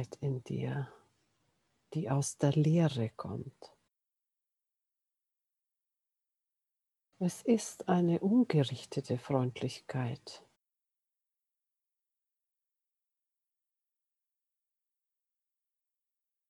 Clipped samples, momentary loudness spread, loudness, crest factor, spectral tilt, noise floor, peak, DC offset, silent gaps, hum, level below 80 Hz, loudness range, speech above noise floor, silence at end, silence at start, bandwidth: under 0.1%; 14 LU; -33 LUFS; 22 dB; -6.5 dB/octave; -89 dBFS; -16 dBFS; under 0.1%; none; none; -76 dBFS; 14 LU; 57 dB; 6.1 s; 0 s; 12.5 kHz